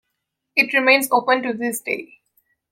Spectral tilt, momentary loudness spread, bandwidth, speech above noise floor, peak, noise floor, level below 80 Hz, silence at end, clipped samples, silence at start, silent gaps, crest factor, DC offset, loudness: -2 dB/octave; 11 LU; 16.5 kHz; 59 dB; -2 dBFS; -78 dBFS; -74 dBFS; 0.65 s; under 0.1%; 0.55 s; none; 20 dB; under 0.1%; -18 LUFS